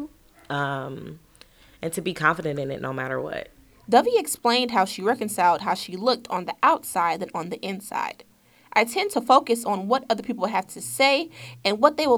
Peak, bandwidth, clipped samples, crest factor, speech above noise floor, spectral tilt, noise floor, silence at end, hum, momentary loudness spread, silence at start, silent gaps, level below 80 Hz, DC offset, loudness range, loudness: -2 dBFS; over 20 kHz; under 0.1%; 22 dB; 29 dB; -3.5 dB/octave; -53 dBFS; 0 s; none; 12 LU; 0 s; none; -62 dBFS; under 0.1%; 6 LU; -24 LUFS